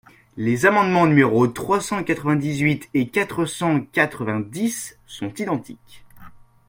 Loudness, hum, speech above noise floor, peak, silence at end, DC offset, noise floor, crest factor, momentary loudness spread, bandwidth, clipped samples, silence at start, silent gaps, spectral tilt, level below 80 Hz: -20 LUFS; none; 23 dB; -2 dBFS; 0.4 s; under 0.1%; -44 dBFS; 20 dB; 12 LU; 16.5 kHz; under 0.1%; 0.35 s; none; -6 dB/octave; -56 dBFS